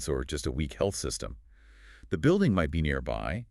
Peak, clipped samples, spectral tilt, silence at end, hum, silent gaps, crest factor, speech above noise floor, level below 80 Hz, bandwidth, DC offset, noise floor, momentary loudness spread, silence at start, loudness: -14 dBFS; under 0.1%; -5.5 dB/octave; 0.05 s; none; none; 16 dB; 25 dB; -42 dBFS; 13.5 kHz; under 0.1%; -54 dBFS; 11 LU; 0 s; -29 LUFS